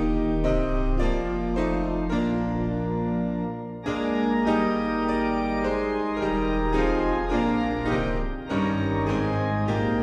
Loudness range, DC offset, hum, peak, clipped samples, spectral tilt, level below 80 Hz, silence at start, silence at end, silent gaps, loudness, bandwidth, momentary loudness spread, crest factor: 2 LU; under 0.1%; none; -10 dBFS; under 0.1%; -7.5 dB/octave; -32 dBFS; 0 s; 0 s; none; -25 LUFS; 8.4 kHz; 4 LU; 14 dB